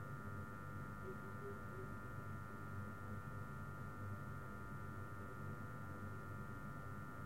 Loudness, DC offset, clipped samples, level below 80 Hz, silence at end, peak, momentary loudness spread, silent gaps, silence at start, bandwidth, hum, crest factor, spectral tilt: -51 LUFS; 0.2%; under 0.1%; -64 dBFS; 0 s; -38 dBFS; 1 LU; none; 0 s; 16.5 kHz; none; 12 dB; -7.5 dB/octave